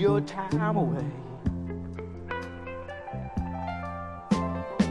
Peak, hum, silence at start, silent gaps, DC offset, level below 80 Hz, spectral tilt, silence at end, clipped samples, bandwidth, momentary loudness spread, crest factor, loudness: -12 dBFS; none; 0 s; none; under 0.1%; -48 dBFS; -7.5 dB/octave; 0 s; under 0.1%; 11 kHz; 12 LU; 18 dB; -32 LUFS